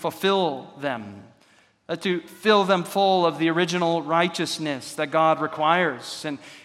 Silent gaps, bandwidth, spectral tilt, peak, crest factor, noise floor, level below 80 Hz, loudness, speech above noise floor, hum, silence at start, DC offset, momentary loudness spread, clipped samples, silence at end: none; 16 kHz; -4.5 dB/octave; -4 dBFS; 20 dB; -59 dBFS; -76 dBFS; -23 LUFS; 36 dB; none; 0 s; under 0.1%; 12 LU; under 0.1%; 0.05 s